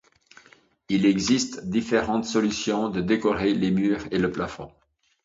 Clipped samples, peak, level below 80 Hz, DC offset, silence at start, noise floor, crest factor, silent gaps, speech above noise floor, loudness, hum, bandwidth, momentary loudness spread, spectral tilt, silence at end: under 0.1%; -8 dBFS; -52 dBFS; under 0.1%; 0.9 s; -57 dBFS; 16 dB; none; 33 dB; -24 LUFS; none; 7.8 kHz; 6 LU; -5 dB/octave; 0.55 s